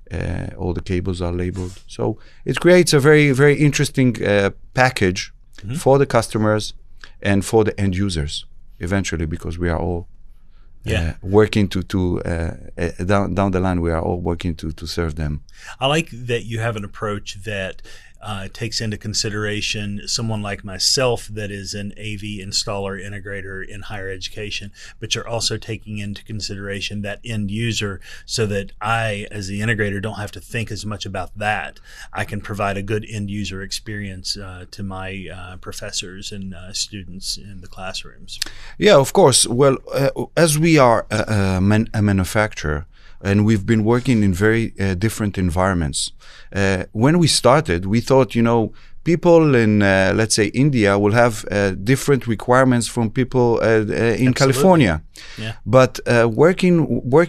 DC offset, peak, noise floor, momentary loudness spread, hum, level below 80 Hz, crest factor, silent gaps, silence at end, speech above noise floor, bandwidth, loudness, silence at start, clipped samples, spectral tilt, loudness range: under 0.1%; 0 dBFS; -41 dBFS; 16 LU; none; -38 dBFS; 18 dB; none; 0 s; 22 dB; 14 kHz; -19 LUFS; 0 s; under 0.1%; -5 dB/octave; 10 LU